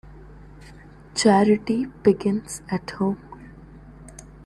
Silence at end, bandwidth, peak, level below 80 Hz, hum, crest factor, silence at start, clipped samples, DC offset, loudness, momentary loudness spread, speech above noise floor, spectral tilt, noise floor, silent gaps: 0.25 s; 12 kHz; -4 dBFS; -50 dBFS; none; 20 dB; 0.1 s; under 0.1%; under 0.1%; -22 LUFS; 26 LU; 24 dB; -5.5 dB/octave; -45 dBFS; none